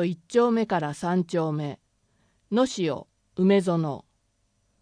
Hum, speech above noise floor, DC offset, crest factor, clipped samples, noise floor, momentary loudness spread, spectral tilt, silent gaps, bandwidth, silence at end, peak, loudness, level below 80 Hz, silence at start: none; 46 dB; under 0.1%; 18 dB; under 0.1%; -70 dBFS; 14 LU; -6.5 dB/octave; none; 10.5 kHz; 0.8 s; -8 dBFS; -25 LUFS; -66 dBFS; 0 s